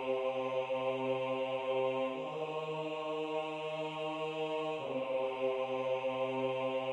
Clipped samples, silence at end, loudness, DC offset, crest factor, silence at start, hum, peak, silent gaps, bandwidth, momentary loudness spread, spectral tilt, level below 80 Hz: under 0.1%; 0 s; -36 LUFS; under 0.1%; 14 dB; 0 s; none; -22 dBFS; none; 9.2 kHz; 4 LU; -6 dB/octave; -78 dBFS